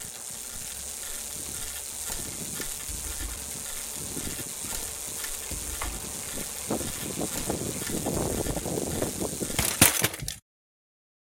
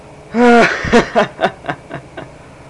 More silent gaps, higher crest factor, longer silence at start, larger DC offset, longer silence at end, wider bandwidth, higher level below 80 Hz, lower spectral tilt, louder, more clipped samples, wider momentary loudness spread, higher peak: neither; first, 30 dB vs 12 dB; about the same, 0 s vs 0.1 s; neither; first, 0.9 s vs 0 s; first, 17 kHz vs 11 kHz; second, -44 dBFS vs -38 dBFS; second, -2.5 dB/octave vs -5 dB/octave; second, -29 LUFS vs -13 LUFS; neither; second, 7 LU vs 21 LU; about the same, -2 dBFS vs -2 dBFS